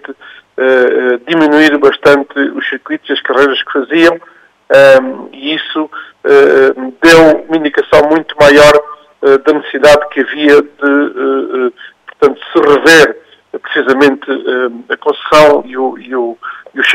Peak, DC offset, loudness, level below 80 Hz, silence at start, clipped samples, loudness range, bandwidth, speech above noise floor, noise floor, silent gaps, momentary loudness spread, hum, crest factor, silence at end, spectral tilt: 0 dBFS; under 0.1%; -9 LUFS; -42 dBFS; 0.1 s; 1%; 3 LU; 16 kHz; 27 dB; -34 dBFS; none; 13 LU; none; 10 dB; 0 s; -4 dB/octave